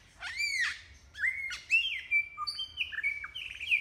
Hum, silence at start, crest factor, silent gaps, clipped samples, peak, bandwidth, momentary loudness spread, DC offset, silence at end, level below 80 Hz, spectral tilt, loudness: none; 0.2 s; 16 dB; none; under 0.1%; -18 dBFS; 17 kHz; 12 LU; under 0.1%; 0 s; -62 dBFS; 1.5 dB/octave; -31 LUFS